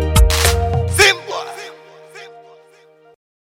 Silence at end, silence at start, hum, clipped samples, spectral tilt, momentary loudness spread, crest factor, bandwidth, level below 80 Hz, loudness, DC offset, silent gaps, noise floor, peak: 1.2 s; 0 s; none; under 0.1%; -3 dB/octave; 26 LU; 18 dB; 16.5 kHz; -22 dBFS; -14 LUFS; under 0.1%; none; -48 dBFS; 0 dBFS